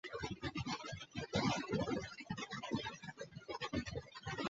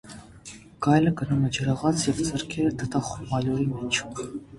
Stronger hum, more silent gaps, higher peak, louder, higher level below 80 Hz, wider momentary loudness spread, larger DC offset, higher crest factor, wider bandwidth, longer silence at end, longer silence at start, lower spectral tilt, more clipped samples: neither; neither; second, -24 dBFS vs -6 dBFS; second, -43 LUFS vs -26 LUFS; second, -60 dBFS vs -50 dBFS; second, 10 LU vs 20 LU; neither; about the same, 18 dB vs 20 dB; second, 8 kHz vs 11.5 kHz; about the same, 0 s vs 0 s; about the same, 0.05 s vs 0.05 s; second, -4 dB/octave vs -5.5 dB/octave; neither